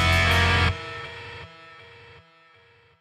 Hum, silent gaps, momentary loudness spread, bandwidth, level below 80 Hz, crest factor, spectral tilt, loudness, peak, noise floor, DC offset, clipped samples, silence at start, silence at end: none; none; 25 LU; 14.5 kHz; -38 dBFS; 18 dB; -4.5 dB/octave; -21 LUFS; -8 dBFS; -57 dBFS; under 0.1%; under 0.1%; 0 s; 1.35 s